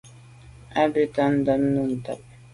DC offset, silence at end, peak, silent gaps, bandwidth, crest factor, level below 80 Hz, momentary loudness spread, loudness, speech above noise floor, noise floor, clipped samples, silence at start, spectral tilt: under 0.1%; 0.35 s; -8 dBFS; none; 11.5 kHz; 18 dB; -54 dBFS; 11 LU; -23 LUFS; 25 dB; -47 dBFS; under 0.1%; 0.05 s; -7.5 dB/octave